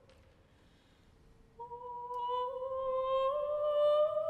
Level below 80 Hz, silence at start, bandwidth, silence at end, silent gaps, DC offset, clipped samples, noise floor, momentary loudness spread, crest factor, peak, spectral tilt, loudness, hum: -66 dBFS; 1.6 s; 4.5 kHz; 0 s; none; under 0.1%; under 0.1%; -65 dBFS; 17 LU; 14 dB; -22 dBFS; -5 dB/octave; -34 LUFS; none